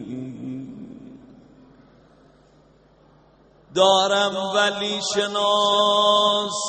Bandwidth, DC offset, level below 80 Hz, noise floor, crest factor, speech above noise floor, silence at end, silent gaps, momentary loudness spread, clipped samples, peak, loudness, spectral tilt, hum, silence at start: 8.8 kHz; under 0.1%; -64 dBFS; -55 dBFS; 20 dB; 35 dB; 0 s; none; 18 LU; under 0.1%; -2 dBFS; -19 LUFS; -2.5 dB/octave; none; 0 s